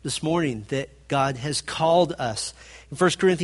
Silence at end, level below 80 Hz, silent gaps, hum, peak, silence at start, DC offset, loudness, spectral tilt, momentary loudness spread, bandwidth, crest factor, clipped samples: 0 s; -52 dBFS; none; none; -6 dBFS; 0.05 s; under 0.1%; -24 LUFS; -4.5 dB/octave; 10 LU; 11.5 kHz; 18 dB; under 0.1%